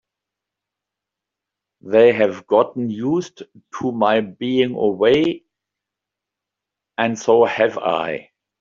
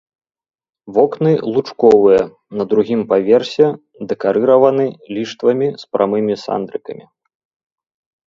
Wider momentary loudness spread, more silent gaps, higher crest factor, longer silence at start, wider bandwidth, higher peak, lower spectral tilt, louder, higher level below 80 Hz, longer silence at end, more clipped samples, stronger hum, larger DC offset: about the same, 12 LU vs 13 LU; neither; about the same, 18 dB vs 16 dB; first, 1.85 s vs 0.85 s; about the same, 7.4 kHz vs 7.4 kHz; about the same, -2 dBFS vs 0 dBFS; second, -4 dB/octave vs -7.5 dB/octave; second, -18 LUFS vs -15 LUFS; about the same, -62 dBFS vs -58 dBFS; second, 0.4 s vs 1.35 s; neither; first, 50 Hz at -55 dBFS vs none; neither